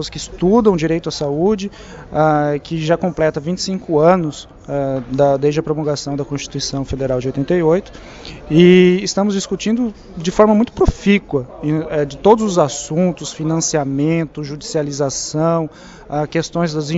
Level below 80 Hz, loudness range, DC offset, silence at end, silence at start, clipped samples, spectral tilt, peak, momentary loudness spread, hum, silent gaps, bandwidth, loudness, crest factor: -38 dBFS; 5 LU; under 0.1%; 0 s; 0 s; under 0.1%; -5.5 dB/octave; 0 dBFS; 11 LU; none; none; 8 kHz; -17 LUFS; 16 dB